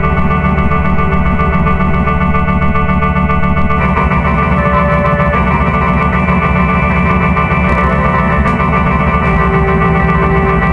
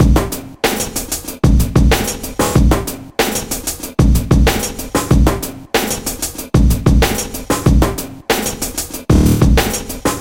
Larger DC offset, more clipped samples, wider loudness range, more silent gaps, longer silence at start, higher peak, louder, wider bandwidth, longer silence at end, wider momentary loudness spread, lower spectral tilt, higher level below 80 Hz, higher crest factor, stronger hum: neither; neither; about the same, 1 LU vs 1 LU; neither; about the same, 0 s vs 0 s; about the same, 0 dBFS vs 0 dBFS; first, -11 LUFS vs -15 LUFS; second, 6 kHz vs 17 kHz; about the same, 0 s vs 0 s; second, 2 LU vs 8 LU; first, -9 dB/octave vs -5 dB/octave; about the same, -18 dBFS vs -18 dBFS; about the same, 10 dB vs 14 dB; neither